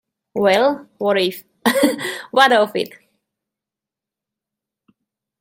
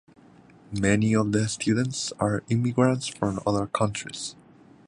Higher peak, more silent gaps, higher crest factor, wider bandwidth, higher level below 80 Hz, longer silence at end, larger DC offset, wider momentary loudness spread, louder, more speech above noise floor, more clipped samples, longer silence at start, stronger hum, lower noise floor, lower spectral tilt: first, 0 dBFS vs -6 dBFS; neither; about the same, 20 dB vs 20 dB; first, 16.5 kHz vs 11 kHz; second, -66 dBFS vs -52 dBFS; first, 2.55 s vs 0.55 s; neither; about the same, 12 LU vs 10 LU; first, -17 LUFS vs -25 LUFS; first, 70 dB vs 28 dB; neither; second, 0.35 s vs 0.7 s; neither; first, -87 dBFS vs -53 dBFS; second, -3.5 dB/octave vs -5.5 dB/octave